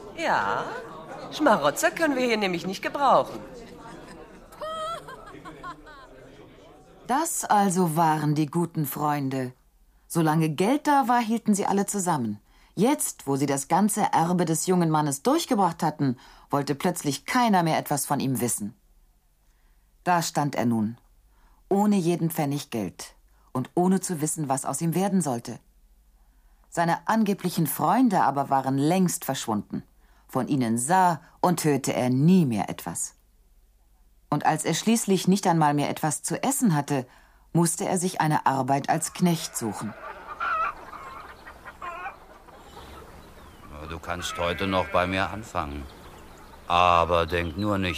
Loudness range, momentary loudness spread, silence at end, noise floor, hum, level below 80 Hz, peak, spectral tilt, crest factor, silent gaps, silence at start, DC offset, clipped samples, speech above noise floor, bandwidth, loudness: 6 LU; 18 LU; 0 s; -62 dBFS; none; -54 dBFS; -4 dBFS; -5 dB/octave; 20 dB; none; 0 s; under 0.1%; under 0.1%; 38 dB; 15.5 kHz; -25 LUFS